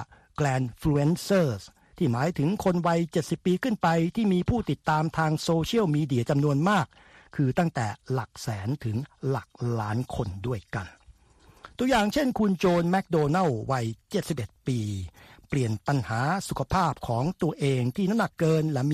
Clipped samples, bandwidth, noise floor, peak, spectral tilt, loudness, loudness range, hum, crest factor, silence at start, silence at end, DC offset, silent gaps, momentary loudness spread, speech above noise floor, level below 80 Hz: under 0.1%; 14.5 kHz; -57 dBFS; -10 dBFS; -6.5 dB/octave; -27 LUFS; 5 LU; none; 16 dB; 0 s; 0 s; under 0.1%; none; 8 LU; 31 dB; -50 dBFS